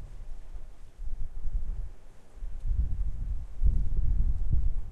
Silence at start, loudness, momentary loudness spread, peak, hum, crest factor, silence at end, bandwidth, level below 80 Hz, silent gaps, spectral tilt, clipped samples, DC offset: 0 s; -35 LUFS; 17 LU; -12 dBFS; none; 16 dB; 0 s; 1.5 kHz; -30 dBFS; none; -9 dB/octave; under 0.1%; under 0.1%